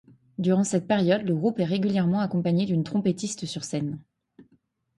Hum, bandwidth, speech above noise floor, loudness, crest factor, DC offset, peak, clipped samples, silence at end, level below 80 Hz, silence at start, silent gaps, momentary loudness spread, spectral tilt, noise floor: none; 11.5 kHz; 42 dB; -25 LUFS; 16 dB; under 0.1%; -10 dBFS; under 0.1%; 0.55 s; -64 dBFS; 0.4 s; none; 8 LU; -6.5 dB/octave; -67 dBFS